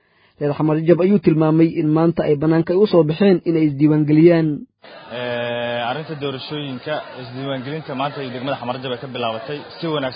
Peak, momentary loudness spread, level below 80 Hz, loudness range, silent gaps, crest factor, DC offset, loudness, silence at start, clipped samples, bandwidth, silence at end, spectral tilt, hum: 0 dBFS; 13 LU; -56 dBFS; 10 LU; none; 18 dB; under 0.1%; -18 LUFS; 0.4 s; under 0.1%; 5.2 kHz; 0 s; -12.5 dB/octave; none